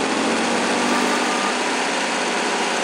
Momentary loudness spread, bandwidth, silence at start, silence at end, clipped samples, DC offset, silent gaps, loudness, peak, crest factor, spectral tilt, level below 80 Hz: 2 LU; 17 kHz; 0 s; 0 s; under 0.1%; under 0.1%; none; -20 LUFS; -6 dBFS; 14 dB; -2 dB/octave; -66 dBFS